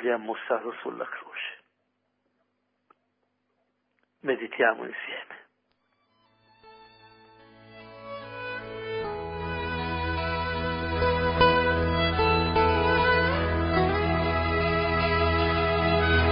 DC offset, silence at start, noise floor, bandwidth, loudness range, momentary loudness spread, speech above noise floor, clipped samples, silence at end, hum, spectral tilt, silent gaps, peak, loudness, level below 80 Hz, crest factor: under 0.1%; 0 s; -76 dBFS; 5.4 kHz; 19 LU; 14 LU; 46 dB; under 0.1%; 0 s; none; -10 dB/octave; none; -6 dBFS; -26 LUFS; -38 dBFS; 20 dB